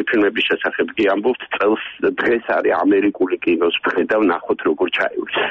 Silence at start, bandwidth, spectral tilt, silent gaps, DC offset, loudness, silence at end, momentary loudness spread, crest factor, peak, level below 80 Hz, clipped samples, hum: 0 s; 6.2 kHz; -6 dB/octave; none; under 0.1%; -18 LUFS; 0 s; 4 LU; 12 dB; -6 dBFS; -58 dBFS; under 0.1%; none